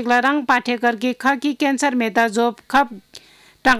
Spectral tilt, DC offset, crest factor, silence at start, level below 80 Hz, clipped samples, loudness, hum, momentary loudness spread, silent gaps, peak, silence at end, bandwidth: -3 dB/octave; under 0.1%; 14 dB; 0 s; -54 dBFS; under 0.1%; -19 LUFS; none; 4 LU; none; -4 dBFS; 0 s; 16 kHz